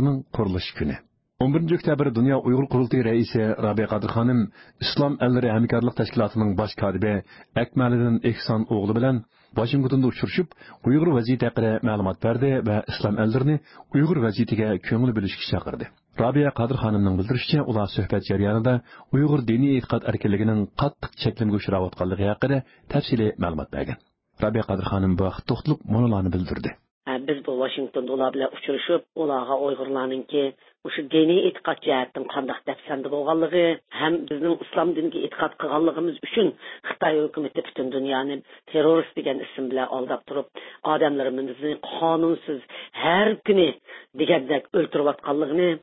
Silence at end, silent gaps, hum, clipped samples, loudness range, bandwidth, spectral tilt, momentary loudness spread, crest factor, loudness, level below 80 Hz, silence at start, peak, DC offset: 0.05 s; 26.91-27.01 s; none; under 0.1%; 3 LU; 5.8 kHz; -11.5 dB/octave; 9 LU; 18 dB; -24 LUFS; -46 dBFS; 0 s; -6 dBFS; under 0.1%